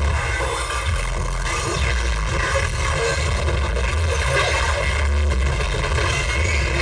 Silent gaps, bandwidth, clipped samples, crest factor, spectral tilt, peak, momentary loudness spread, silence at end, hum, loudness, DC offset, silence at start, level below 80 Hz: none; 10 kHz; under 0.1%; 14 dB; -4 dB/octave; -6 dBFS; 4 LU; 0 s; none; -21 LUFS; under 0.1%; 0 s; -24 dBFS